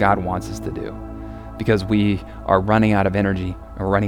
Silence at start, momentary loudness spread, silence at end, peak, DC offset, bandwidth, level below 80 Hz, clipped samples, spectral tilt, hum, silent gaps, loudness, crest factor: 0 s; 16 LU; 0 s; 0 dBFS; under 0.1%; 14 kHz; -36 dBFS; under 0.1%; -7.5 dB/octave; none; none; -20 LUFS; 20 dB